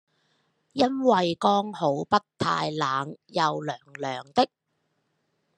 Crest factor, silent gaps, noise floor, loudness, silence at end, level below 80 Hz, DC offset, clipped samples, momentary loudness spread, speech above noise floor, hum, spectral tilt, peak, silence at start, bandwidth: 22 dB; none; -75 dBFS; -26 LUFS; 1.1 s; -70 dBFS; under 0.1%; under 0.1%; 11 LU; 50 dB; none; -5.5 dB/octave; -4 dBFS; 0.75 s; 11 kHz